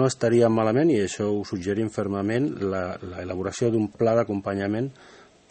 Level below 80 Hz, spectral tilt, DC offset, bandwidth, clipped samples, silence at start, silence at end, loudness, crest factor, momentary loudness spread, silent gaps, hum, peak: -60 dBFS; -6.5 dB/octave; under 0.1%; 8.8 kHz; under 0.1%; 0 s; 0.35 s; -25 LUFS; 16 dB; 10 LU; none; none; -8 dBFS